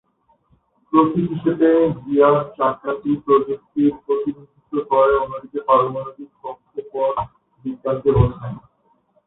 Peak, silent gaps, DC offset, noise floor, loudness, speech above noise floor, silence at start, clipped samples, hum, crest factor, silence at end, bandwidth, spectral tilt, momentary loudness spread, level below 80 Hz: -2 dBFS; none; under 0.1%; -61 dBFS; -19 LUFS; 43 dB; 0.9 s; under 0.1%; none; 18 dB; 0.7 s; 4 kHz; -13 dB/octave; 17 LU; -42 dBFS